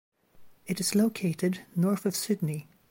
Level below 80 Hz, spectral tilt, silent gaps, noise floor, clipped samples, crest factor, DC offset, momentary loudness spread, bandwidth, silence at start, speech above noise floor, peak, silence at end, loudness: -70 dBFS; -5.5 dB/octave; none; -53 dBFS; under 0.1%; 14 dB; under 0.1%; 10 LU; 16.5 kHz; 0.4 s; 25 dB; -14 dBFS; 0.3 s; -29 LUFS